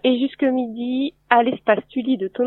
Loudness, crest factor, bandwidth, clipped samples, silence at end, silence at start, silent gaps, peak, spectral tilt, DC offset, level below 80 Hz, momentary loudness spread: -20 LUFS; 20 dB; 4.2 kHz; under 0.1%; 0 s; 0.05 s; none; 0 dBFS; -8 dB/octave; under 0.1%; -64 dBFS; 6 LU